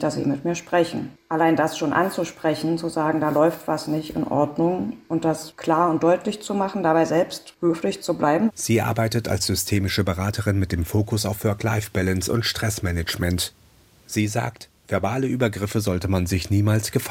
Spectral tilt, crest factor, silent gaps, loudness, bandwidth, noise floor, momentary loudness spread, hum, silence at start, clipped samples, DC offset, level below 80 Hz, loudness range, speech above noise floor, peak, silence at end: -5.5 dB/octave; 18 dB; none; -23 LUFS; 17 kHz; -52 dBFS; 6 LU; none; 0 s; under 0.1%; under 0.1%; -46 dBFS; 3 LU; 30 dB; -6 dBFS; 0 s